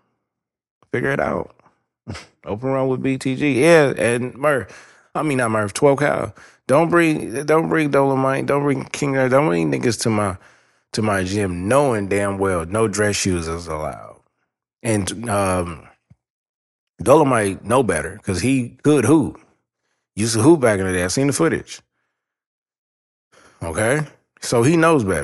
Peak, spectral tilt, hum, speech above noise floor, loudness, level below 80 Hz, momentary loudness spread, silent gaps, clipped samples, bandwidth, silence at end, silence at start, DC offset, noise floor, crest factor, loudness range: -2 dBFS; -5.5 dB/octave; none; 64 dB; -19 LUFS; -48 dBFS; 15 LU; 16.30-16.94 s, 22.46-22.66 s, 22.78-23.31 s; under 0.1%; 12.5 kHz; 0 s; 0.95 s; under 0.1%; -82 dBFS; 18 dB; 6 LU